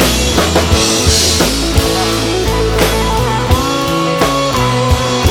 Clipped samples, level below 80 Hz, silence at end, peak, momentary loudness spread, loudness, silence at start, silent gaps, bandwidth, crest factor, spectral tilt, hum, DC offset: under 0.1%; -20 dBFS; 0 s; 0 dBFS; 4 LU; -12 LUFS; 0 s; none; 18.5 kHz; 12 dB; -4 dB/octave; none; under 0.1%